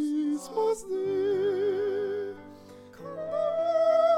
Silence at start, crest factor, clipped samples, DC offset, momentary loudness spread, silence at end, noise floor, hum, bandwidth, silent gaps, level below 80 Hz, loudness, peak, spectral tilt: 0 s; 14 dB; under 0.1%; under 0.1%; 18 LU; 0 s; -48 dBFS; none; 13.5 kHz; none; -68 dBFS; -28 LUFS; -14 dBFS; -5.5 dB/octave